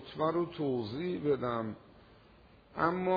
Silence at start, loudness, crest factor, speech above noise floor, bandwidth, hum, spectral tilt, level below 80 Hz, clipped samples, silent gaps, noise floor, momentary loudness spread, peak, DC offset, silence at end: 0 s; -34 LUFS; 20 dB; 27 dB; 5 kHz; none; -9 dB/octave; -64 dBFS; under 0.1%; none; -60 dBFS; 10 LU; -14 dBFS; under 0.1%; 0 s